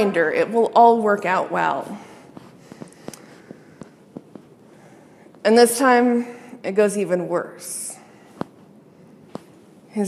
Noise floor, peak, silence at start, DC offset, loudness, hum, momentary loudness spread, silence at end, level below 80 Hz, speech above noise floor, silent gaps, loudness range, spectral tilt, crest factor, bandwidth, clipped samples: -48 dBFS; -2 dBFS; 0 s; under 0.1%; -19 LUFS; none; 26 LU; 0 s; -72 dBFS; 30 dB; none; 10 LU; -4.5 dB/octave; 20 dB; 15 kHz; under 0.1%